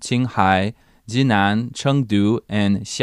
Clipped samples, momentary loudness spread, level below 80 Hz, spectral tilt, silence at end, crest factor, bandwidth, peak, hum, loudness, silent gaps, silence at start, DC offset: under 0.1%; 5 LU; -54 dBFS; -5.5 dB/octave; 0 s; 16 dB; 11.5 kHz; -2 dBFS; none; -19 LUFS; none; 0 s; under 0.1%